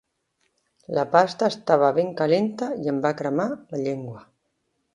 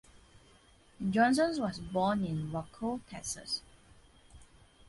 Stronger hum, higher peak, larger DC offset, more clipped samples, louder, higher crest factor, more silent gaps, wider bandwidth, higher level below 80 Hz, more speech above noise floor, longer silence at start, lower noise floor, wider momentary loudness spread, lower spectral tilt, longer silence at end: neither; first, -2 dBFS vs -14 dBFS; neither; neither; first, -23 LUFS vs -33 LUFS; about the same, 22 dB vs 22 dB; neither; about the same, 11 kHz vs 11.5 kHz; second, -70 dBFS vs -60 dBFS; first, 51 dB vs 30 dB; first, 0.9 s vs 0.15 s; first, -74 dBFS vs -62 dBFS; about the same, 10 LU vs 12 LU; first, -6.5 dB/octave vs -5 dB/octave; first, 0.75 s vs 0.45 s